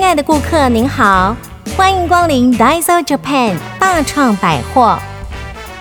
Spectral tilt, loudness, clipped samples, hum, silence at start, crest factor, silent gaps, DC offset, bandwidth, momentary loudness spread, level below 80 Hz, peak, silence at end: -4.5 dB/octave; -12 LUFS; under 0.1%; none; 0 s; 12 dB; none; under 0.1%; over 20 kHz; 13 LU; -30 dBFS; 0 dBFS; 0 s